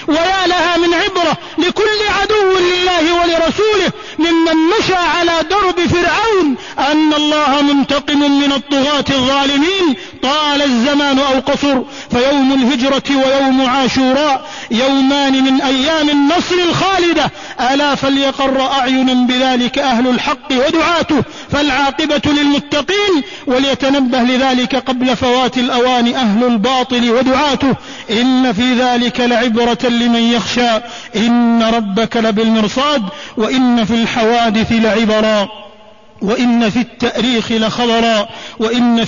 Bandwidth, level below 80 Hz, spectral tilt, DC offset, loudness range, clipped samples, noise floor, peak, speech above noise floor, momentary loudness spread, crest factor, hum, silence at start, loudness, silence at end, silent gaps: 7.4 kHz; -40 dBFS; -4 dB/octave; 0.6%; 1 LU; under 0.1%; -41 dBFS; -4 dBFS; 29 dB; 4 LU; 10 dB; none; 0 s; -13 LUFS; 0 s; none